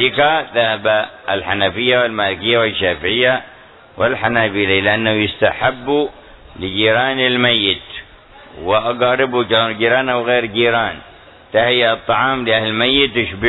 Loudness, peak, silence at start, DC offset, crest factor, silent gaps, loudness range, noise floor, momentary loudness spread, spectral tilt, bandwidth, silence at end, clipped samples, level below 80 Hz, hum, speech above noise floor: -15 LUFS; 0 dBFS; 0 s; under 0.1%; 16 dB; none; 1 LU; -41 dBFS; 7 LU; -7.5 dB/octave; 4.1 kHz; 0 s; under 0.1%; -46 dBFS; none; 26 dB